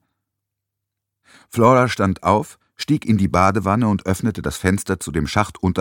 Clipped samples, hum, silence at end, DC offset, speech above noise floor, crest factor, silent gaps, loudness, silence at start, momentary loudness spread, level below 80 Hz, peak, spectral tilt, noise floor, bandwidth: under 0.1%; none; 0 s; under 0.1%; 63 dB; 18 dB; none; -19 LUFS; 1.55 s; 8 LU; -42 dBFS; 0 dBFS; -6 dB/octave; -81 dBFS; 17.5 kHz